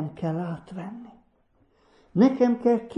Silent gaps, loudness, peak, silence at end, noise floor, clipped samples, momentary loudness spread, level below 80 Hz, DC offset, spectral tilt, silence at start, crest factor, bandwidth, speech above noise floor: none; -24 LUFS; -6 dBFS; 0 s; -65 dBFS; under 0.1%; 18 LU; -64 dBFS; under 0.1%; -9 dB/octave; 0 s; 20 dB; 6.4 kHz; 41 dB